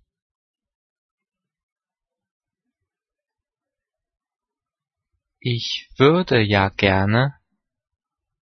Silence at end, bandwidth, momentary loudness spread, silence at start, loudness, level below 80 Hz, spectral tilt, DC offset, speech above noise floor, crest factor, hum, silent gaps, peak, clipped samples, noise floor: 1.1 s; 6.4 kHz; 9 LU; 5.45 s; -19 LUFS; -54 dBFS; -6.5 dB/octave; under 0.1%; 71 dB; 22 dB; none; none; -2 dBFS; under 0.1%; -89 dBFS